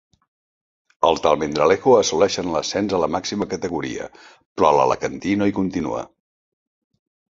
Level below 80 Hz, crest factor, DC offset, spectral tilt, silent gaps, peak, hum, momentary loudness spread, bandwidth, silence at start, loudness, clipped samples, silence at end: -50 dBFS; 20 dB; under 0.1%; -4.5 dB/octave; 4.46-4.55 s; -2 dBFS; none; 13 LU; 7.8 kHz; 1 s; -20 LUFS; under 0.1%; 1.25 s